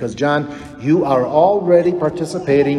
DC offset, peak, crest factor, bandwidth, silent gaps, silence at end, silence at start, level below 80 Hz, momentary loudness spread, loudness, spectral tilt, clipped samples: under 0.1%; 0 dBFS; 14 dB; 12 kHz; none; 0 s; 0 s; -50 dBFS; 9 LU; -16 LUFS; -7 dB/octave; under 0.1%